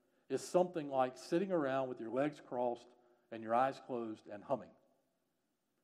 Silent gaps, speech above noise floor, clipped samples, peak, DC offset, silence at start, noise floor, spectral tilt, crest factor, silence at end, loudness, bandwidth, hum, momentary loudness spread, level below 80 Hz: none; 46 dB; under 0.1%; -20 dBFS; under 0.1%; 0.3 s; -84 dBFS; -6 dB/octave; 20 dB; 1.15 s; -38 LUFS; 13.5 kHz; none; 11 LU; under -90 dBFS